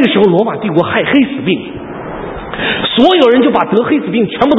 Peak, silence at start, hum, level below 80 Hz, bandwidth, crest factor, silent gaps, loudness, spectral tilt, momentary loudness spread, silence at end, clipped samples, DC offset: 0 dBFS; 0 s; none; -40 dBFS; 7.8 kHz; 12 dB; none; -11 LUFS; -7.5 dB/octave; 15 LU; 0 s; 0.3%; under 0.1%